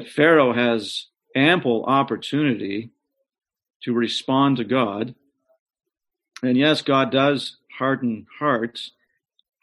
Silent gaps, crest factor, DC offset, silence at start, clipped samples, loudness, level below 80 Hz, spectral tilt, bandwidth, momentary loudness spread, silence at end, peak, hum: 3.76-3.80 s, 5.59-5.66 s; 18 dB; under 0.1%; 0 s; under 0.1%; -21 LUFS; -66 dBFS; -6 dB/octave; 11.5 kHz; 13 LU; 0.75 s; -4 dBFS; none